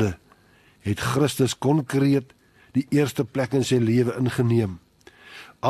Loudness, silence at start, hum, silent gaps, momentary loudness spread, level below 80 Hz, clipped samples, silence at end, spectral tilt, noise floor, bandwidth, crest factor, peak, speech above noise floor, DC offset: -23 LUFS; 0 s; none; none; 17 LU; -54 dBFS; under 0.1%; 0 s; -6.5 dB/octave; -57 dBFS; 13 kHz; 16 dB; -8 dBFS; 35 dB; under 0.1%